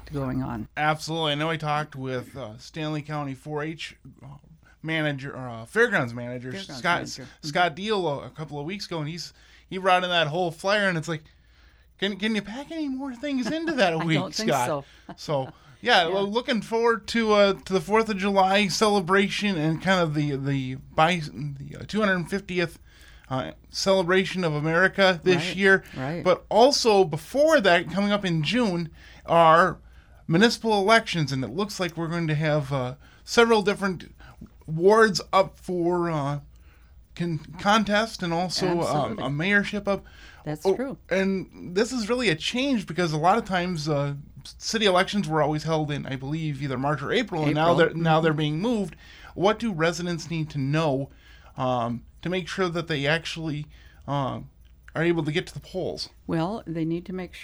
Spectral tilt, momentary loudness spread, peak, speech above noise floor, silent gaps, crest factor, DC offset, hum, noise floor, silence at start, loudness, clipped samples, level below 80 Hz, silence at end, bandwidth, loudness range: -5 dB/octave; 14 LU; -4 dBFS; 31 dB; none; 20 dB; under 0.1%; none; -55 dBFS; 0.05 s; -24 LUFS; under 0.1%; -52 dBFS; 0 s; over 20 kHz; 7 LU